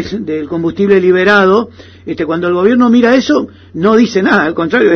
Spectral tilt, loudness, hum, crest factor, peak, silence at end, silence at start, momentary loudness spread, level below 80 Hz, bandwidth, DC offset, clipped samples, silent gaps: -6 dB/octave; -11 LUFS; none; 10 dB; 0 dBFS; 0 s; 0 s; 11 LU; -48 dBFS; 6.6 kHz; under 0.1%; under 0.1%; none